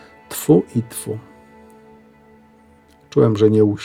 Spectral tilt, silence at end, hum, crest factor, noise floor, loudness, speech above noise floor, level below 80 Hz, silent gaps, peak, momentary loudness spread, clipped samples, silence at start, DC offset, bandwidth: -7 dB/octave; 0 s; none; 18 dB; -51 dBFS; -18 LUFS; 35 dB; -58 dBFS; none; -2 dBFS; 16 LU; under 0.1%; 0.3 s; under 0.1%; 17 kHz